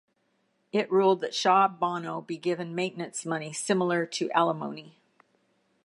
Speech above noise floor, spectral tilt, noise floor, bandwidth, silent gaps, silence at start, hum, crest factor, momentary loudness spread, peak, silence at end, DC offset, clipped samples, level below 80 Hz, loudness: 45 dB; -4.5 dB/octave; -73 dBFS; 11.5 kHz; none; 0.75 s; none; 20 dB; 12 LU; -8 dBFS; 0.95 s; under 0.1%; under 0.1%; -84 dBFS; -27 LUFS